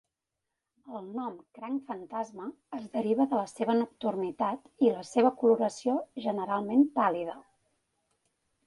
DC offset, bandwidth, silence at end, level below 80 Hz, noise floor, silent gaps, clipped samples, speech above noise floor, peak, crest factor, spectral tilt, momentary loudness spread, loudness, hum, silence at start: under 0.1%; 11.5 kHz; 1.25 s; -76 dBFS; -86 dBFS; none; under 0.1%; 57 dB; -10 dBFS; 20 dB; -6 dB/octave; 15 LU; -30 LUFS; none; 0.85 s